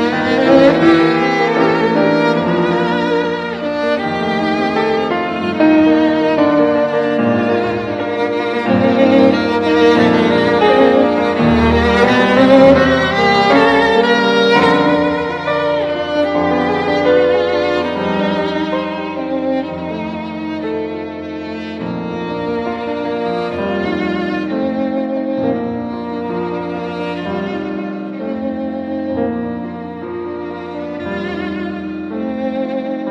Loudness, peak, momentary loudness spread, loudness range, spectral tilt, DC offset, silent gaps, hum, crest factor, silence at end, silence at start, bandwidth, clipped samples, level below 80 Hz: -15 LUFS; 0 dBFS; 12 LU; 11 LU; -6.5 dB/octave; under 0.1%; none; none; 14 dB; 0 s; 0 s; 9.6 kHz; under 0.1%; -40 dBFS